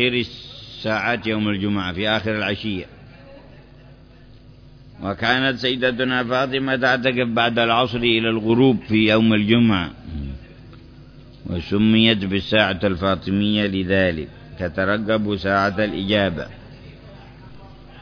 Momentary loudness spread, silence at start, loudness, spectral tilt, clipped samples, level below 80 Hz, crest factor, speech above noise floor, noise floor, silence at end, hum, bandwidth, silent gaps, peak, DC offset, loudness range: 14 LU; 0 s; -19 LUFS; -7 dB/octave; under 0.1%; -44 dBFS; 20 dB; 26 dB; -46 dBFS; 0 s; none; 5.4 kHz; none; -2 dBFS; under 0.1%; 7 LU